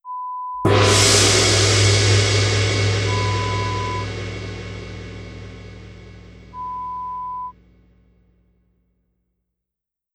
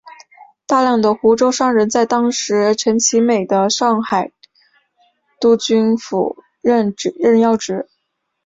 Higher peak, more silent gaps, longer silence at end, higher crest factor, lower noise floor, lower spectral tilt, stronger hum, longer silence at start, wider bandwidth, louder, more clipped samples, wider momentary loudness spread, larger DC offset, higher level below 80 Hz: about the same, -2 dBFS vs -2 dBFS; neither; first, 2.65 s vs 0.65 s; about the same, 18 dB vs 14 dB; first, -85 dBFS vs -72 dBFS; about the same, -3.5 dB/octave vs -4 dB/octave; neither; about the same, 0.05 s vs 0.05 s; first, 14 kHz vs 7.8 kHz; about the same, -17 LUFS vs -15 LUFS; neither; first, 23 LU vs 7 LU; neither; first, -38 dBFS vs -58 dBFS